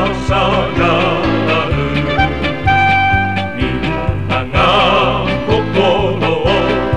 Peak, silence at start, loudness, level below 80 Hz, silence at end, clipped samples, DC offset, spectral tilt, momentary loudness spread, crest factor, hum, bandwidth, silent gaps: 0 dBFS; 0 s; -13 LUFS; -26 dBFS; 0 s; under 0.1%; 3%; -6.5 dB/octave; 7 LU; 12 dB; none; 10.5 kHz; none